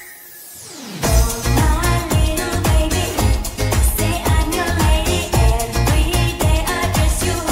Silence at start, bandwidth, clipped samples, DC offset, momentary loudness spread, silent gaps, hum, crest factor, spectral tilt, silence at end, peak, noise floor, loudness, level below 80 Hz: 0 s; 16.5 kHz; under 0.1%; under 0.1%; 6 LU; none; none; 14 dB; -4.5 dB/octave; 0 s; -2 dBFS; -37 dBFS; -17 LUFS; -20 dBFS